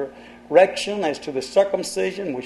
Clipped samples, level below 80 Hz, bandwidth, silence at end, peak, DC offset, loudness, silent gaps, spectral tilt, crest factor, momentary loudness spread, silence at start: under 0.1%; -60 dBFS; 12.5 kHz; 0 s; -2 dBFS; under 0.1%; -21 LUFS; none; -4 dB/octave; 20 dB; 9 LU; 0 s